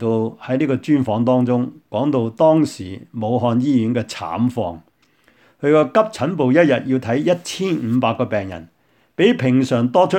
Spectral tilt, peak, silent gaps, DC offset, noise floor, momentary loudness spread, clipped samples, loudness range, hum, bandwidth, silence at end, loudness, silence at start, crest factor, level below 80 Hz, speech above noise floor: -7 dB/octave; 0 dBFS; none; under 0.1%; -57 dBFS; 10 LU; under 0.1%; 2 LU; none; 11 kHz; 0 s; -18 LUFS; 0 s; 18 dB; -60 dBFS; 40 dB